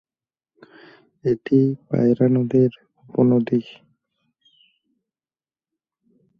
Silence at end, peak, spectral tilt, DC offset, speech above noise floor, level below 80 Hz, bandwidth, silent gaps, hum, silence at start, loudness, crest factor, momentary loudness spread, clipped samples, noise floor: 2.7 s; -4 dBFS; -10.5 dB/octave; under 0.1%; over 71 dB; -62 dBFS; 5.2 kHz; none; none; 1.25 s; -20 LUFS; 18 dB; 7 LU; under 0.1%; under -90 dBFS